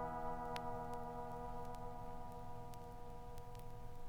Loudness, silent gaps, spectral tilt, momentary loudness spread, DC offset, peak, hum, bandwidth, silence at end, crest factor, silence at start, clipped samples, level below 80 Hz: -50 LUFS; none; -6 dB/octave; 9 LU; under 0.1%; -24 dBFS; 60 Hz at -60 dBFS; 19.5 kHz; 0 s; 22 dB; 0 s; under 0.1%; -54 dBFS